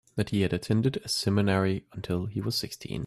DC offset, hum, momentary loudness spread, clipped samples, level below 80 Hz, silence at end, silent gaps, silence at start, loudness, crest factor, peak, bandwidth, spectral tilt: under 0.1%; none; 7 LU; under 0.1%; -56 dBFS; 0 s; none; 0.15 s; -28 LUFS; 16 dB; -12 dBFS; 14 kHz; -5.5 dB/octave